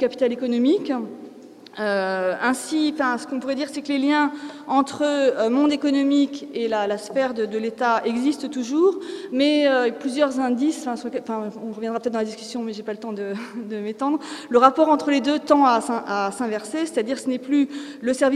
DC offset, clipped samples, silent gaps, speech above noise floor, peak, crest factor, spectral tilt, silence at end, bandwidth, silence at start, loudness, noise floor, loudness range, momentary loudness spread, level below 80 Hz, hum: under 0.1%; under 0.1%; none; 21 dB; 0 dBFS; 22 dB; -4 dB/octave; 0 s; 13 kHz; 0 s; -22 LUFS; -43 dBFS; 6 LU; 11 LU; -70 dBFS; none